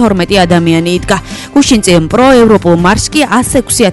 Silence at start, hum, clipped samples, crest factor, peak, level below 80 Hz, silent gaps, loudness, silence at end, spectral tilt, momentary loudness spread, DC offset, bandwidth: 0 s; none; 1%; 8 dB; 0 dBFS; -28 dBFS; none; -8 LUFS; 0 s; -4.5 dB/octave; 6 LU; under 0.1%; 12 kHz